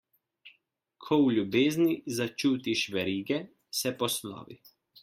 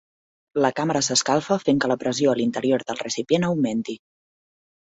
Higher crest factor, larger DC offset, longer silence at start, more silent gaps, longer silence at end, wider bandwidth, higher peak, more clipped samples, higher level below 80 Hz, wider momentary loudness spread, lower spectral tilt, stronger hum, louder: about the same, 18 dB vs 18 dB; neither; about the same, 0.45 s vs 0.55 s; neither; second, 0.5 s vs 0.9 s; first, 16.5 kHz vs 8.4 kHz; second, -12 dBFS vs -6 dBFS; neither; second, -72 dBFS vs -64 dBFS; about the same, 9 LU vs 8 LU; about the same, -4.5 dB/octave vs -4 dB/octave; neither; second, -29 LUFS vs -22 LUFS